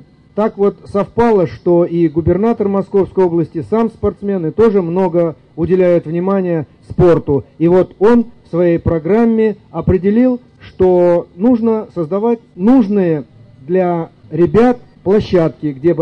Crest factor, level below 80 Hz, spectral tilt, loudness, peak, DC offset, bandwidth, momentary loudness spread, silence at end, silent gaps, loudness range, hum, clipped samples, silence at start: 10 dB; -40 dBFS; -10 dB/octave; -14 LUFS; -2 dBFS; 0.2%; 6.4 kHz; 7 LU; 0 s; none; 2 LU; none; under 0.1%; 0.35 s